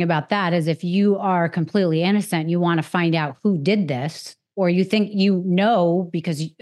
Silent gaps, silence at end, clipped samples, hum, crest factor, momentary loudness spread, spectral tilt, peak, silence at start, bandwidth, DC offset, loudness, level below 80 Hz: none; 0.15 s; under 0.1%; none; 16 dB; 7 LU; -7 dB/octave; -4 dBFS; 0 s; 12.5 kHz; under 0.1%; -20 LUFS; -80 dBFS